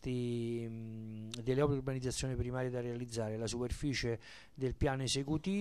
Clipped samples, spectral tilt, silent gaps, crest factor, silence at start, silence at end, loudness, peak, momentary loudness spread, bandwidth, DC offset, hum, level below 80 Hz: under 0.1%; -5.5 dB/octave; none; 18 dB; 0 s; 0 s; -38 LUFS; -20 dBFS; 10 LU; 13 kHz; under 0.1%; none; -50 dBFS